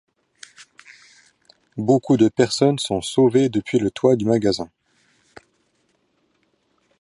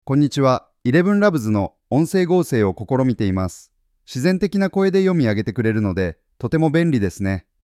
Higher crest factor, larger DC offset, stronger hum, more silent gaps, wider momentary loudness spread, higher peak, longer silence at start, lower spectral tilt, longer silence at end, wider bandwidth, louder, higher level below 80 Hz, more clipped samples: about the same, 18 dB vs 16 dB; neither; neither; neither; about the same, 10 LU vs 8 LU; about the same, -4 dBFS vs -2 dBFS; first, 1.75 s vs 0.05 s; second, -6 dB/octave vs -7.5 dB/octave; first, 2.35 s vs 0.25 s; second, 11.5 kHz vs 14.5 kHz; about the same, -19 LUFS vs -19 LUFS; second, -56 dBFS vs -48 dBFS; neither